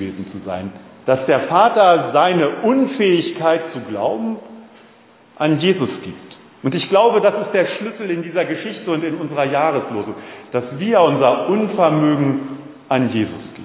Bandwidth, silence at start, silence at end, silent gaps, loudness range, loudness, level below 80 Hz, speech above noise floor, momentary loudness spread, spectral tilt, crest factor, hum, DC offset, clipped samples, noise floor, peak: 4 kHz; 0 s; 0 s; none; 6 LU; -17 LUFS; -58 dBFS; 31 dB; 14 LU; -10.5 dB/octave; 16 dB; none; under 0.1%; under 0.1%; -48 dBFS; 0 dBFS